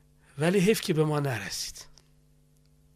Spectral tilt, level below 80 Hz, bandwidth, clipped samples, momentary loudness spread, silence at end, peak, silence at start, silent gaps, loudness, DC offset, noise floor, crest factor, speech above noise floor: -5 dB/octave; -58 dBFS; 15.5 kHz; under 0.1%; 16 LU; 1.15 s; -12 dBFS; 0.35 s; none; -27 LUFS; under 0.1%; -62 dBFS; 18 dB; 35 dB